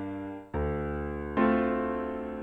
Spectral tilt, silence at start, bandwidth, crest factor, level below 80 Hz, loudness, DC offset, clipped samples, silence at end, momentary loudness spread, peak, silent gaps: -9.5 dB/octave; 0 s; 4.6 kHz; 16 dB; -42 dBFS; -31 LUFS; under 0.1%; under 0.1%; 0 s; 11 LU; -14 dBFS; none